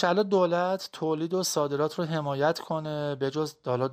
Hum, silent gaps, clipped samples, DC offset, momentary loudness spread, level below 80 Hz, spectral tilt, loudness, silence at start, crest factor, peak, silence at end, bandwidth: none; none; under 0.1%; under 0.1%; 7 LU; -72 dBFS; -5 dB/octave; -28 LUFS; 0 s; 16 dB; -10 dBFS; 0 s; 15.5 kHz